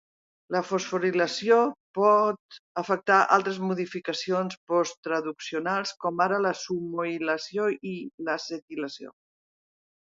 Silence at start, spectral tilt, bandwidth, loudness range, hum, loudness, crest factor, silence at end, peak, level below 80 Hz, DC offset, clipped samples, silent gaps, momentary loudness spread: 0.5 s; -4.5 dB/octave; 7.8 kHz; 6 LU; none; -27 LUFS; 22 dB; 0.95 s; -6 dBFS; -78 dBFS; under 0.1%; under 0.1%; 1.80-1.94 s, 2.39-2.49 s, 2.59-2.75 s, 4.57-4.67 s, 4.97-5.03 s, 8.14-8.18 s, 8.62-8.68 s; 13 LU